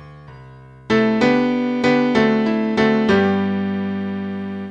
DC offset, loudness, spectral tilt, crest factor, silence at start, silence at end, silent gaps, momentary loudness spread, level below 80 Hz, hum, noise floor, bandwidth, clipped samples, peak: 0.1%; -18 LUFS; -7 dB/octave; 16 dB; 0 s; 0 s; none; 9 LU; -52 dBFS; none; -41 dBFS; 8 kHz; under 0.1%; -2 dBFS